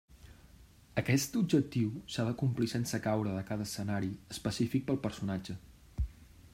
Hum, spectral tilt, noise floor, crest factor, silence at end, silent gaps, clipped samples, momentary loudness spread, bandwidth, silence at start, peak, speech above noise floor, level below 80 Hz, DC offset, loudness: none; -5.5 dB/octave; -58 dBFS; 20 dB; 0.05 s; none; under 0.1%; 11 LU; 16 kHz; 0.1 s; -14 dBFS; 25 dB; -50 dBFS; under 0.1%; -34 LUFS